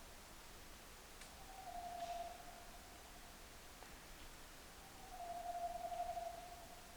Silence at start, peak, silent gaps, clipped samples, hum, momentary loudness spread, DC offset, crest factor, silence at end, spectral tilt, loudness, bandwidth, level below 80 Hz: 0 s; -34 dBFS; none; under 0.1%; none; 11 LU; under 0.1%; 16 dB; 0 s; -3 dB/octave; -52 LUFS; over 20 kHz; -62 dBFS